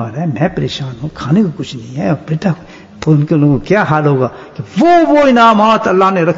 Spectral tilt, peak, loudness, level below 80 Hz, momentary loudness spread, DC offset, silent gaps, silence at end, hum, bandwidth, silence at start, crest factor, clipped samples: -7.5 dB/octave; 0 dBFS; -12 LUFS; -42 dBFS; 15 LU; under 0.1%; none; 0 s; none; 7.8 kHz; 0 s; 12 dB; under 0.1%